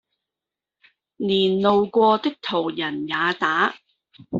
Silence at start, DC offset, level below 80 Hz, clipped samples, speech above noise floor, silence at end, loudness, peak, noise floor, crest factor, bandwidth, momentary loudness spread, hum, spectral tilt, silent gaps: 1.2 s; under 0.1%; -62 dBFS; under 0.1%; 67 dB; 0 s; -21 LUFS; -4 dBFS; -88 dBFS; 18 dB; 7.6 kHz; 7 LU; none; -6 dB/octave; none